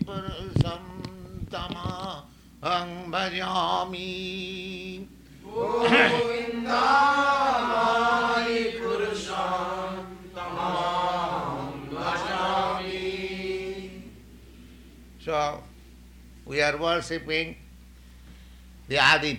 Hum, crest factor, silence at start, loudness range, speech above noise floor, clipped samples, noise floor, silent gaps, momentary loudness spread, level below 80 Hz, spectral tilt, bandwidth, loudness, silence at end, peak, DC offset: none; 24 dB; 0 s; 9 LU; 24 dB; under 0.1%; -49 dBFS; none; 17 LU; -50 dBFS; -4.5 dB/octave; 16.5 kHz; -26 LUFS; 0 s; -4 dBFS; under 0.1%